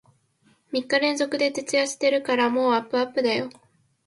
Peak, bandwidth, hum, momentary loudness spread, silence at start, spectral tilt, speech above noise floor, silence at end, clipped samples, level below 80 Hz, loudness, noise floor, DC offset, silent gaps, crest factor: -6 dBFS; 11.5 kHz; none; 7 LU; 0.7 s; -2.5 dB/octave; 40 dB; 0.55 s; under 0.1%; -74 dBFS; -23 LUFS; -63 dBFS; under 0.1%; none; 18 dB